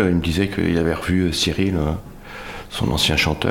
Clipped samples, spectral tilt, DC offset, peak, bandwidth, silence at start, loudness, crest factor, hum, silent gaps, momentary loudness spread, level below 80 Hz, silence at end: under 0.1%; -5 dB/octave; under 0.1%; -4 dBFS; 17 kHz; 0 s; -20 LUFS; 16 dB; none; none; 16 LU; -34 dBFS; 0 s